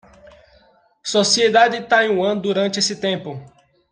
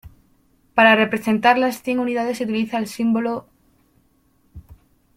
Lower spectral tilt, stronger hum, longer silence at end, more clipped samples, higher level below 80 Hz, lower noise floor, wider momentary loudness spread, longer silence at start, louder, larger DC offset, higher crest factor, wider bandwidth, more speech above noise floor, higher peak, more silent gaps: second, -3 dB/octave vs -5 dB/octave; neither; about the same, 0.45 s vs 0.45 s; neither; second, -62 dBFS vs -56 dBFS; second, -55 dBFS vs -61 dBFS; first, 14 LU vs 10 LU; first, 1.05 s vs 0.05 s; about the same, -17 LUFS vs -19 LUFS; neither; about the same, 18 dB vs 20 dB; second, 10 kHz vs 16 kHz; second, 37 dB vs 42 dB; about the same, -2 dBFS vs -2 dBFS; neither